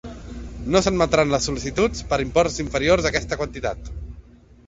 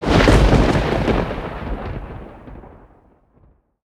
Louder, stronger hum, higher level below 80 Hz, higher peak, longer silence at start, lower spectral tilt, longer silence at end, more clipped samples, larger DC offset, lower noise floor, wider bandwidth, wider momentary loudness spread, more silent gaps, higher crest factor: second, -21 LUFS vs -17 LUFS; neither; second, -36 dBFS vs -24 dBFS; second, -4 dBFS vs 0 dBFS; about the same, 0.05 s vs 0 s; second, -4.5 dB/octave vs -6.5 dB/octave; second, 0.45 s vs 1.15 s; neither; neither; second, -46 dBFS vs -55 dBFS; second, 8 kHz vs 12 kHz; second, 18 LU vs 24 LU; neither; about the same, 20 dB vs 18 dB